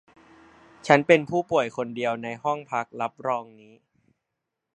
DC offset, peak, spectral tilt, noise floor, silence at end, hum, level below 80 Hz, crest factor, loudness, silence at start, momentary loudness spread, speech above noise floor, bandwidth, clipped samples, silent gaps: under 0.1%; 0 dBFS; -5.5 dB/octave; -83 dBFS; 1.3 s; none; -68 dBFS; 26 dB; -24 LUFS; 0.85 s; 12 LU; 58 dB; 9 kHz; under 0.1%; none